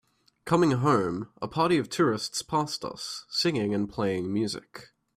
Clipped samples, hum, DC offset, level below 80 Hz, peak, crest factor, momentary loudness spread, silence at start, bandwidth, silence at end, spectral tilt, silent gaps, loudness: under 0.1%; none; under 0.1%; -62 dBFS; -10 dBFS; 18 dB; 11 LU; 0.45 s; 14.5 kHz; 0.35 s; -5 dB/octave; none; -27 LUFS